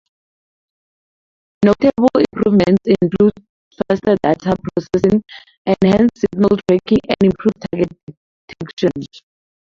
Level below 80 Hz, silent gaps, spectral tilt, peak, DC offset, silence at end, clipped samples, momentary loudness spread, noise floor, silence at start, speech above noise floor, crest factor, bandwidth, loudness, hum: -46 dBFS; 3.49-3.71 s, 5.58-5.65 s, 8.03-8.07 s, 8.17-8.48 s, 8.73-8.77 s; -8 dB/octave; -2 dBFS; under 0.1%; 0.55 s; under 0.1%; 8 LU; under -90 dBFS; 1.6 s; over 75 dB; 16 dB; 7.4 kHz; -16 LUFS; none